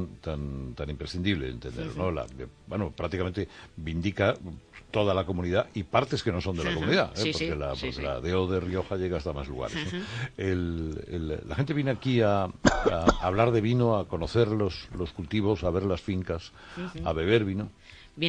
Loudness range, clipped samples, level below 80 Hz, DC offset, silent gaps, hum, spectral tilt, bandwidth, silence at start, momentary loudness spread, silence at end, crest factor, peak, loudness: 6 LU; under 0.1%; -44 dBFS; under 0.1%; none; none; -6.5 dB/octave; 10 kHz; 0 s; 12 LU; 0 s; 24 dB; -6 dBFS; -29 LUFS